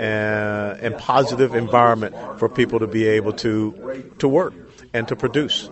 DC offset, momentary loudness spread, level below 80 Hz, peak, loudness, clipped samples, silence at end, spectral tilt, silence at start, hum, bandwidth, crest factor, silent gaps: under 0.1%; 10 LU; -52 dBFS; 0 dBFS; -20 LUFS; under 0.1%; 0 s; -6 dB/octave; 0 s; none; 8.2 kHz; 20 dB; none